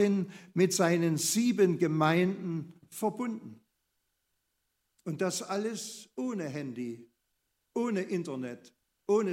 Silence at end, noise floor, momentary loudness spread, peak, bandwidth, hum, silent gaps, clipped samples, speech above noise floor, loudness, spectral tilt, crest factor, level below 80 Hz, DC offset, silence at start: 0 s; -80 dBFS; 16 LU; -12 dBFS; 16 kHz; none; none; under 0.1%; 50 dB; -31 LUFS; -5 dB/octave; 20 dB; -80 dBFS; under 0.1%; 0 s